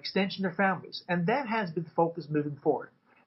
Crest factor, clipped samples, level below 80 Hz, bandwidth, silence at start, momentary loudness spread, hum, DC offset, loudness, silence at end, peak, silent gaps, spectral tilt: 16 dB; under 0.1%; -74 dBFS; 6 kHz; 0.05 s; 5 LU; none; under 0.1%; -30 LUFS; 0.4 s; -14 dBFS; none; -9 dB/octave